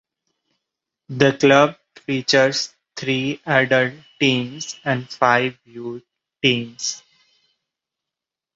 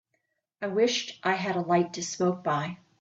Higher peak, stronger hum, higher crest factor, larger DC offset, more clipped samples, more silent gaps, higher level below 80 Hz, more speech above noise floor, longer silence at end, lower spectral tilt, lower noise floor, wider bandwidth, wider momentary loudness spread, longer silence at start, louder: first, -2 dBFS vs -12 dBFS; neither; about the same, 20 dB vs 18 dB; neither; neither; neither; first, -62 dBFS vs -72 dBFS; first, 68 dB vs 50 dB; first, 1.55 s vs 0.25 s; about the same, -4 dB/octave vs -4.5 dB/octave; first, -87 dBFS vs -77 dBFS; about the same, 8 kHz vs 8 kHz; first, 17 LU vs 6 LU; first, 1.1 s vs 0.6 s; first, -19 LUFS vs -28 LUFS